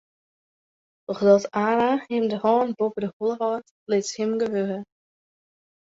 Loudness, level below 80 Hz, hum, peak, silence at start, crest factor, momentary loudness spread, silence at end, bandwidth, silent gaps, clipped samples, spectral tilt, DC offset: -23 LUFS; -70 dBFS; none; -4 dBFS; 1.1 s; 20 dB; 11 LU; 1.1 s; 8 kHz; 3.13-3.20 s, 3.71-3.86 s; under 0.1%; -5.5 dB/octave; under 0.1%